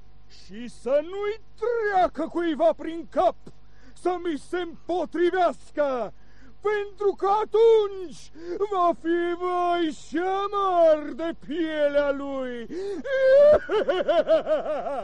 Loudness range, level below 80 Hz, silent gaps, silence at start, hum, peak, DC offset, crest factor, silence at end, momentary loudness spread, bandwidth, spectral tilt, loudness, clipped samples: 5 LU; -54 dBFS; none; 0.5 s; 50 Hz at -55 dBFS; -10 dBFS; 1%; 14 dB; 0 s; 13 LU; 10.5 kHz; -5 dB/octave; -24 LUFS; under 0.1%